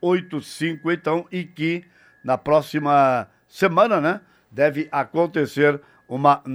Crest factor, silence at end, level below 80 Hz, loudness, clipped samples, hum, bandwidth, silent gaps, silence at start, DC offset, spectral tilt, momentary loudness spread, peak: 18 dB; 0 s; -62 dBFS; -21 LUFS; under 0.1%; none; over 20 kHz; none; 0.05 s; under 0.1%; -6.5 dB/octave; 14 LU; -2 dBFS